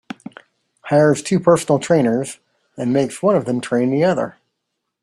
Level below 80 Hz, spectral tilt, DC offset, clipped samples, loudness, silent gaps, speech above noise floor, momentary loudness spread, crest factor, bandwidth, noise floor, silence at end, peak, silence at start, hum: -58 dBFS; -6 dB/octave; under 0.1%; under 0.1%; -17 LUFS; none; 60 dB; 14 LU; 16 dB; 13 kHz; -76 dBFS; 0.75 s; -2 dBFS; 0.85 s; none